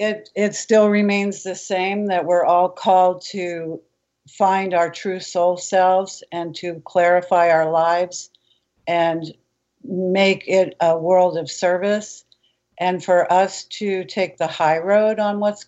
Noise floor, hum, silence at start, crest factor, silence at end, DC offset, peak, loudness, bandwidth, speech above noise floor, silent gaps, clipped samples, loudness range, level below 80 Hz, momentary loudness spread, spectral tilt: -64 dBFS; none; 0 s; 14 dB; 0.05 s; under 0.1%; -4 dBFS; -19 LUFS; 8.2 kHz; 45 dB; none; under 0.1%; 3 LU; -72 dBFS; 12 LU; -4.5 dB/octave